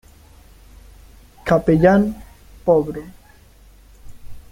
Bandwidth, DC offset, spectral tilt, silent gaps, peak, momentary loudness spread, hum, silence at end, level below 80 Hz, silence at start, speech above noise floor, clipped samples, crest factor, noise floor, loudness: 16 kHz; under 0.1%; -8.5 dB/octave; none; -2 dBFS; 18 LU; none; 0.15 s; -42 dBFS; 1.45 s; 32 dB; under 0.1%; 20 dB; -48 dBFS; -17 LUFS